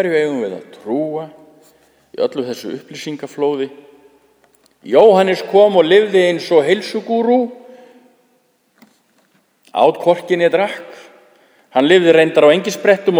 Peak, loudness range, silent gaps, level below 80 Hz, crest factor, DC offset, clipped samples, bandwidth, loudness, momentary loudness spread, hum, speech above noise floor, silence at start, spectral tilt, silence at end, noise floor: 0 dBFS; 11 LU; none; -68 dBFS; 16 dB; under 0.1%; under 0.1%; over 20 kHz; -14 LUFS; 17 LU; none; 46 dB; 0 s; -5 dB/octave; 0 s; -59 dBFS